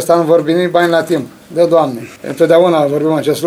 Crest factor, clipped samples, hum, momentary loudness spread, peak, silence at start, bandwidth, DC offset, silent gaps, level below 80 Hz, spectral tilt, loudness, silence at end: 12 dB; under 0.1%; none; 9 LU; 0 dBFS; 0 s; 16 kHz; under 0.1%; none; -60 dBFS; -6 dB/octave; -12 LUFS; 0 s